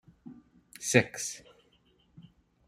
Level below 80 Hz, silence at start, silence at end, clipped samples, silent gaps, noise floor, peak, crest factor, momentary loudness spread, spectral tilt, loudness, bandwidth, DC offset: -70 dBFS; 0.25 s; 0.45 s; under 0.1%; none; -67 dBFS; -4 dBFS; 30 dB; 26 LU; -4 dB/octave; -29 LUFS; 15.5 kHz; under 0.1%